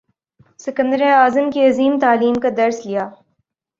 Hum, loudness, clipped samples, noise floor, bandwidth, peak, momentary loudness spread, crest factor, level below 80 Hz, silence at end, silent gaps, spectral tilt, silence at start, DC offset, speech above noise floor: none; -16 LUFS; under 0.1%; -69 dBFS; 7.6 kHz; -2 dBFS; 12 LU; 16 dB; -62 dBFS; 0.65 s; none; -5 dB/octave; 0.65 s; under 0.1%; 54 dB